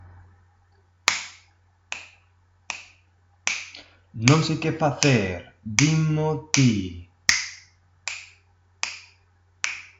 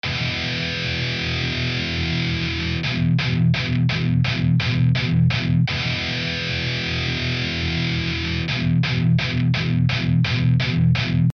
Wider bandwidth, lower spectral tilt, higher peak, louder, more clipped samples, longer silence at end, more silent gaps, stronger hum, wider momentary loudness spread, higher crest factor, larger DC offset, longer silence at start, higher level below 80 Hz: first, 11.5 kHz vs 6.6 kHz; second, -4 dB/octave vs -6 dB/octave; first, 0 dBFS vs -8 dBFS; second, -24 LUFS vs -21 LUFS; neither; about the same, 0.15 s vs 0.05 s; neither; neither; first, 17 LU vs 4 LU; first, 26 dB vs 12 dB; neither; about the same, 0.05 s vs 0.05 s; second, -58 dBFS vs -38 dBFS